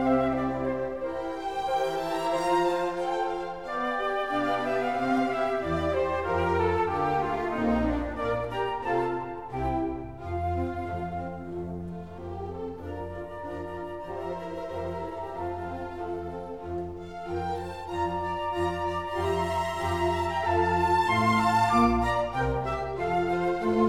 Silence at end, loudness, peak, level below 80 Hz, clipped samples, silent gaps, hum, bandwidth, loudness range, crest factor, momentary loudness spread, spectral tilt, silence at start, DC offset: 0 s; -29 LUFS; -10 dBFS; -46 dBFS; under 0.1%; none; none; 15 kHz; 11 LU; 18 dB; 12 LU; -6.5 dB/octave; 0 s; 0.3%